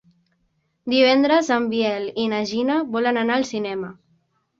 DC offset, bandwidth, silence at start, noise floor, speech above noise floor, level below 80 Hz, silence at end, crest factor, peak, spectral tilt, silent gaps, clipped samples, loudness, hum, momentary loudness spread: under 0.1%; 7.8 kHz; 0.85 s; -69 dBFS; 49 dB; -64 dBFS; 0.65 s; 16 dB; -4 dBFS; -4.5 dB/octave; none; under 0.1%; -20 LUFS; none; 12 LU